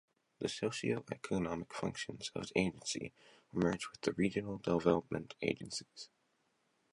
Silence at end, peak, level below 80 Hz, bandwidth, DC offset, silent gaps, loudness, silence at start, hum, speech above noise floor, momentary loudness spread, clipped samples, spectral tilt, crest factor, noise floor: 0.85 s; -16 dBFS; -64 dBFS; 11.5 kHz; under 0.1%; none; -38 LUFS; 0.4 s; none; 41 dB; 10 LU; under 0.1%; -5 dB/octave; 22 dB; -78 dBFS